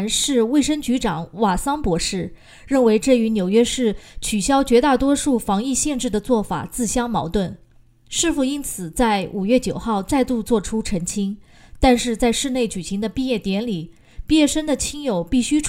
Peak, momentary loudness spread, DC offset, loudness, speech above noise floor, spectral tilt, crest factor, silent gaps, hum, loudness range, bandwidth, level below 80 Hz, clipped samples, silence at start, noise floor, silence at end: 0 dBFS; 8 LU; under 0.1%; -20 LUFS; 30 dB; -4 dB/octave; 20 dB; none; none; 4 LU; 16 kHz; -38 dBFS; under 0.1%; 0 s; -49 dBFS; 0 s